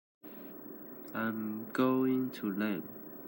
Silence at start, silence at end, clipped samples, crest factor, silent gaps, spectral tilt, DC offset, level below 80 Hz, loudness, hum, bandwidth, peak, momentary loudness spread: 0.25 s; 0 s; under 0.1%; 18 dB; none; -7.5 dB/octave; under 0.1%; -82 dBFS; -34 LUFS; none; 16.5 kHz; -18 dBFS; 17 LU